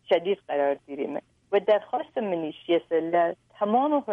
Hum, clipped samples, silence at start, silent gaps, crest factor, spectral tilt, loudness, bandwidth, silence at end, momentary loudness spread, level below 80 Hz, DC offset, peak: none; under 0.1%; 0.1 s; none; 16 dB; -7.5 dB/octave; -26 LUFS; 5.8 kHz; 0 s; 9 LU; -74 dBFS; under 0.1%; -10 dBFS